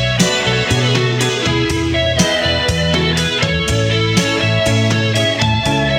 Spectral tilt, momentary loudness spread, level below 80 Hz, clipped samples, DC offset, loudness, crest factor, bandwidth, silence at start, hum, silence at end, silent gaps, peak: -4.5 dB/octave; 2 LU; -32 dBFS; under 0.1%; under 0.1%; -14 LUFS; 14 dB; 16 kHz; 0 s; none; 0 s; none; 0 dBFS